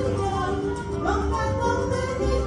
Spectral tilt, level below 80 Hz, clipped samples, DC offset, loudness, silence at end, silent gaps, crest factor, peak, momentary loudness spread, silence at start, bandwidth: -6.5 dB/octave; -32 dBFS; under 0.1%; under 0.1%; -25 LUFS; 0 s; none; 12 dB; -12 dBFS; 3 LU; 0 s; 11 kHz